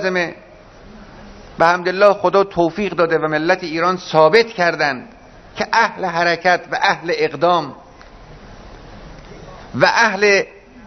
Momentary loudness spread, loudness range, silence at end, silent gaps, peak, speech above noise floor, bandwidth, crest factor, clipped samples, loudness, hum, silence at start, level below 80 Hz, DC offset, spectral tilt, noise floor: 10 LU; 4 LU; 0.05 s; none; 0 dBFS; 25 dB; 7 kHz; 18 dB; under 0.1%; -16 LUFS; none; 0 s; -48 dBFS; under 0.1%; -4.5 dB/octave; -41 dBFS